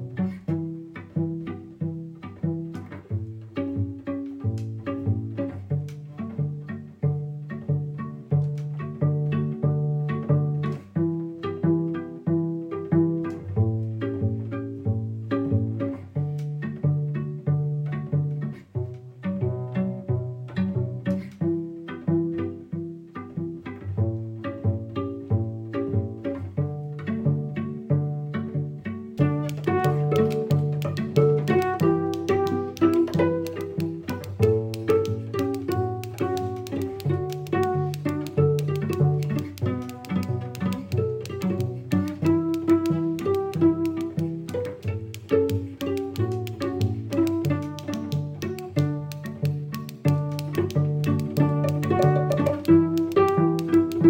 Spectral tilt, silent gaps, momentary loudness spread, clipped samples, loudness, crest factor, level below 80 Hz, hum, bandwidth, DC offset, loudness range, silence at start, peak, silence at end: -8.5 dB/octave; none; 10 LU; under 0.1%; -26 LUFS; 18 dB; -62 dBFS; none; 16.5 kHz; under 0.1%; 7 LU; 0 s; -6 dBFS; 0 s